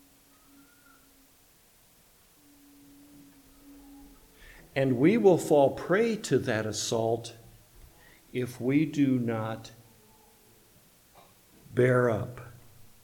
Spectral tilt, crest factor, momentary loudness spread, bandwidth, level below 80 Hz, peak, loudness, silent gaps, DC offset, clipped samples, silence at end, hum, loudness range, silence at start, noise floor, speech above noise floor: -6 dB/octave; 20 dB; 17 LU; 19 kHz; -62 dBFS; -10 dBFS; -27 LUFS; none; under 0.1%; under 0.1%; 0.2 s; none; 6 LU; 3.7 s; -61 dBFS; 35 dB